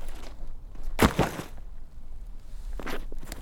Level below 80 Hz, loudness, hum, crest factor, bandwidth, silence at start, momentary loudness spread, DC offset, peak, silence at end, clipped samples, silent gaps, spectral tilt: -36 dBFS; -29 LUFS; none; 24 dB; 17 kHz; 0 s; 24 LU; under 0.1%; -6 dBFS; 0 s; under 0.1%; none; -5 dB/octave